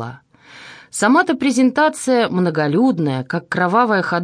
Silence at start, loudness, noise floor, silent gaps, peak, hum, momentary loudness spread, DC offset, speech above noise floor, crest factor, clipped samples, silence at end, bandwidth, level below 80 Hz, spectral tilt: 0 s; -16 LUFS; -41 dBFS; none; -2 dBFS; none; 8 LU; under 0.1%; 25 dB; 14 dB; under 0.1%; 0 s; 10.5 kHz; -66 dBFS; -5.5 dB/octave